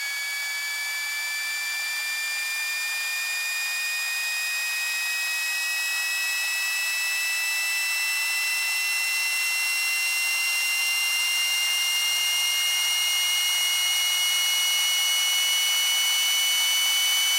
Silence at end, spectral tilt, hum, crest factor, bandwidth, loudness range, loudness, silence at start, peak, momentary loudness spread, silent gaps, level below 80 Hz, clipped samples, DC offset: 0 s; 11 dB/octave; none; 12 dB; 16 kHz; 5 LU; -22 LUFS; 0 s; -12 dBFS; 6 LU; none; under -90 dBFS; under 0.1%; under 0.1%